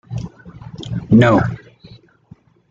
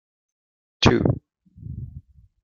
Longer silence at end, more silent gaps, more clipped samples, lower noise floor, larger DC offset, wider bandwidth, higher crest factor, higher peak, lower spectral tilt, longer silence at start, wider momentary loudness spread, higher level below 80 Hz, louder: first, 1.15 s vs 0.45 s; neither; neither; about the same, -47 dBFS vs -46 dBFS; neither; about the same, 7.4 kHz vs 7.4 kHz; second, 18 dB vs 24 dB; about the same, -2 dBFS vs -2 dBFS; first, -8 dB/octave vs -6 dB/octave; second, 0.1 s vs 0.8 s; about the same, 24 LU vs 22 LU; about the same, -44 dBFS vs -42 dBFS; first, -15 LUFS vs -21 LUFS